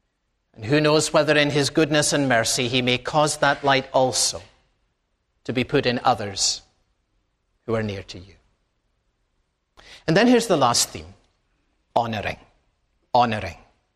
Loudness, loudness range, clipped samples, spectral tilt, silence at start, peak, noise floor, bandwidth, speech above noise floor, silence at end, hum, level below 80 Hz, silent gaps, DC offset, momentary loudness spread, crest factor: -21 LUFS; 9 LU; under 0.1%; -3.5 dB/octave; 0.6 s; -2 dBFS; -73 dBFS; 15 kHz; 52 dB; 0.4 s; none; -52 dBFS; none; under 0.1%; 16 LU; 20 dB